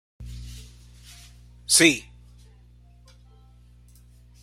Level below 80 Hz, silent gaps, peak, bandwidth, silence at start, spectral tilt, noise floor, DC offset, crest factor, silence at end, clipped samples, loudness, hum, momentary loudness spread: -48 dBFS; none; -4 dBFS; 16 kHz; 0.2 s; -2 dB/octave; -52 dBFS; under 0.1%; 26 dB; 2.45 s; under 0.1%; -18 LUFS; 60 Hz at -50 dBFS; 28 LU